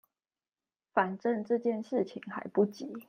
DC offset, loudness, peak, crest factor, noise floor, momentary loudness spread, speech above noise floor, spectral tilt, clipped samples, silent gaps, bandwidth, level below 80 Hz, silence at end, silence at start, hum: under 0.1%; -32 LUFS; -12 dBFS; 22 dB; under -90 dBFS; 4 LU; over 58 dB; -7.5 dB/octave; under 0.1%; none; 15.5 kHz; -82 dBFS; 0.05 s; 0.95 s; none